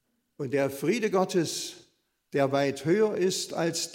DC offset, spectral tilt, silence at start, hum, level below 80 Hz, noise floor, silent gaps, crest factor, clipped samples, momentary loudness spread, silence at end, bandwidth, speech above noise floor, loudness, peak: under 0.1%; -4.5 dB/octave; 0.4 s; none; -74 dBFS; -67 dBFS; none; 18 dB; under 0.1%; 8 LU; 0 s; 16.5 kHz; 40 dB; -27 LUFS; -10 dBFS